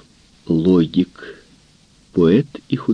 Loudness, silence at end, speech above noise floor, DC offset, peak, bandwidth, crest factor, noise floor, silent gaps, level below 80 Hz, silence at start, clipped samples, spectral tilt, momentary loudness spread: -18 LUFS; 0 s; 36 dB; under 0.1%; -4 dBFS; 9 kHz; 16 dB; -52 dBFS; none; -50 dBFS; 0.5 s; under 0.1%; -9 dB/octave; 13 LU